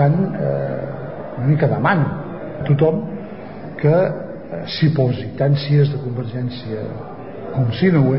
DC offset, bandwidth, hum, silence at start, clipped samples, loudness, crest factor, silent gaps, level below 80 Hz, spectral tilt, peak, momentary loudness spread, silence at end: 0.9%; 5.8 kHz; none; 0 s; under 0.1%; -19 LUFS; 14 dB; none; -48 dBFS; -12.5 dB/octave; -4 dBFS; 14 LU; 0 s